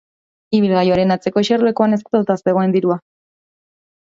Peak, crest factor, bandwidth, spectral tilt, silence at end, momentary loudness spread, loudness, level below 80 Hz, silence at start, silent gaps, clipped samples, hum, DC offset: 0 dBFS; 16 dB; 7.6 kHz; -7 dB/octave; 1.05 s; 4 LU; -16 LUFS; -54 dBFS; 0.5 s; none; under 0.1%; none; under 0.1%